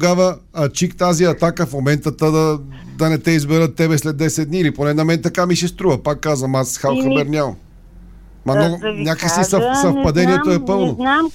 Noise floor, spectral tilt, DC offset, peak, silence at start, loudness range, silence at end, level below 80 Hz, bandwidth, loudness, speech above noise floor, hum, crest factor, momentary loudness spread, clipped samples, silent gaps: -40 dBFS; -5.5 dB/octave; under 0.1%; -2 dBFS; 0 s; 2 LU; 0 s; -42 dBFS; 16.5 kHz; -17 LUFS; 24 dB; none; 14 dB; 5 LU; under 0.1%; none